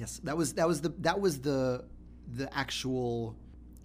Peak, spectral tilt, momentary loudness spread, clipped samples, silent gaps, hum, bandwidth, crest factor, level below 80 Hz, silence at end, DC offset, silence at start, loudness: -14 dBFS; -5 dB/octave; 14 LU; under 0.1%; none; none; 15.5 kHz; 20 dB; -52 dBFS; 0 s; under 0.1%; 0 s; -32 LUFS